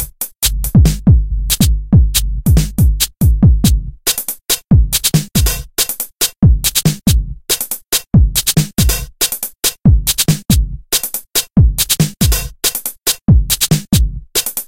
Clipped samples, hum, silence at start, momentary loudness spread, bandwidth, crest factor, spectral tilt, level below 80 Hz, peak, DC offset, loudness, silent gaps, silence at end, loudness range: under 0.1%; none; 0 s; 5 LU; 17 kHz; 12 dB; -4 dB/octave; -18 dBFS; 0 dBFS; under 0.1%; -13 LUFS; none; 0.05 s; 1 LU